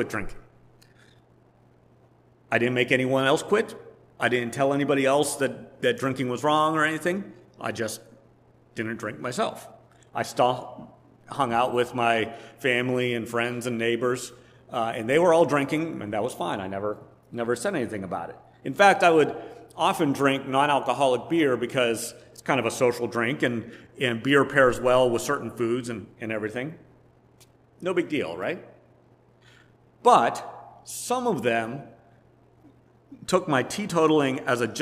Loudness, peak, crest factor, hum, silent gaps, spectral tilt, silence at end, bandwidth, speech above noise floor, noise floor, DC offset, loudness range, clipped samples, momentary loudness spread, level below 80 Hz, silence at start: -25 LUFS; -2 dBFS; 24 dB; none; none; -4.5 dB/octave; 0 s; 16 kHz; 34 dB; -58 dBFS; under 0.1%; 7 LU; under 0.1%; 15 LU; -58 dBFS; 0 s